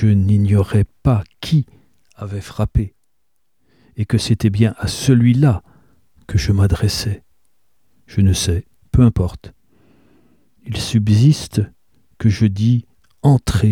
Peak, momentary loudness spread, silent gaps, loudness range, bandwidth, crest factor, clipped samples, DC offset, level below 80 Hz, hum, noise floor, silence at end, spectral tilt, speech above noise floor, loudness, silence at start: -2 dBFS; 14 LU; none; 4 LU; 14.5 kHz; 16 dB; under 0.1%; 0.2%; -32 dBFS; none; -73 dBFS; 0 s; -6.5 dB/octave; 58 dB; -17 LUFS; 0 s